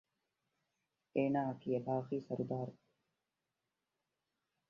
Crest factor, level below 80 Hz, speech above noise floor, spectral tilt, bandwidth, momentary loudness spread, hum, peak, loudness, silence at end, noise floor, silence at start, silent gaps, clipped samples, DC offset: 20 dB; -80 dBFS; 52 dB; -8 dB/octave; 6.6 kHz; 7 LU; none; -22 dBFS; -39 LUFS; 1.95 s; -89 dBFS; 1.15 s; none; under 0.1%; under 0.1%